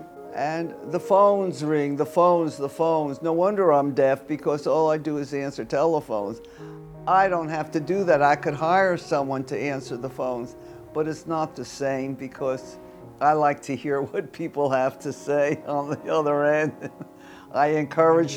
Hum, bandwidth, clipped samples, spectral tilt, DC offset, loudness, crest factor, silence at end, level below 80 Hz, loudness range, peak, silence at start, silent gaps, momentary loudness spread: none; 18 kHz; under 0.1%; -6.5 dB/octave; under 0.1%; -24 LUFS; 18 dB; 0 s; -62 dBFS; 6 LU; -6 dBFS; 0 s; none; 14 LU